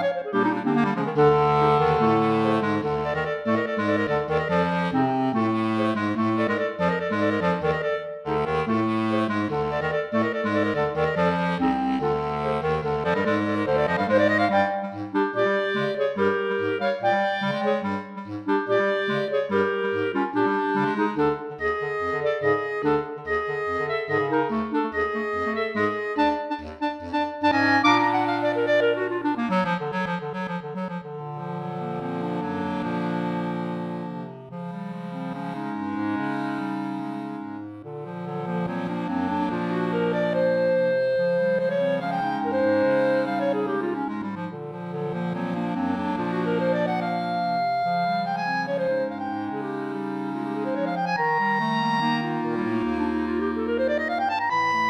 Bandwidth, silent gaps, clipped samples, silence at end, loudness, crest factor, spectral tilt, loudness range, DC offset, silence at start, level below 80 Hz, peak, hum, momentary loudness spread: 10.5 kHz; none; under 0.1%; 0 s; -24 LUFS; 18 dB; -7 dB/octave; 7 LU; under 0.1%; 0 s; -54 dBFS; -6 dBFS; none; 9 LU